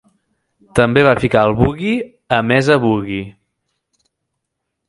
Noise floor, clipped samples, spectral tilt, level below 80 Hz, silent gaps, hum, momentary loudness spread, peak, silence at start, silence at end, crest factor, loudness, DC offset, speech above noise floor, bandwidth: -76 dBFS; under 0.1%; -6.5 dB/octave; -40 dBFS; none; none; 10 LU; 0 dBFS; 0.75 s; 1.55 s; 16 dB; -15 LUFS; under 0.1%; 62 dB; 11.5 kHz